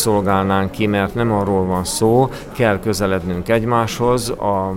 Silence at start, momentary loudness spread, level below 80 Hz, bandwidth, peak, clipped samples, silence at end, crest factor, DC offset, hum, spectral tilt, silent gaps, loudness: 0 s; 4 LU; -38 dBFS; 16.5 kHz; -2 dBFS; under 0.1%; 0 s; 14 dB; under 0.1%; none; -5.5 dB/octave; none; -17 LUFS